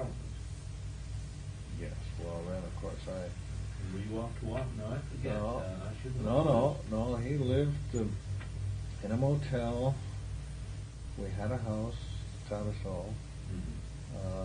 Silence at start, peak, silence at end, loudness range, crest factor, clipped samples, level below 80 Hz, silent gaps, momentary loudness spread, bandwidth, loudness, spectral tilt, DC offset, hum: 0 s; -14 dBFS; 0 s; 8 LU; 22 dB; under 0.1%; -44 dBFS; none; 12 LU; 10.5 kHz; -37 LUFS; -7.5 dB/octave; under 0.1%; none